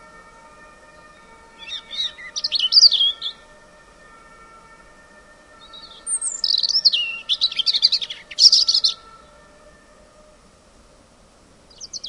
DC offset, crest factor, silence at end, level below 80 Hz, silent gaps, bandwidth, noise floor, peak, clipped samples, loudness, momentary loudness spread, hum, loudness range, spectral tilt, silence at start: under 0.1%; 24 dB; 0 s; -58 dBFS; none; 11.5 kHz; -52 dBFS; 0 dBFS; under 0.1%; -16 LUFS; 22 LU; none; 10 LU; 2.5 dB/octave; 1.6 s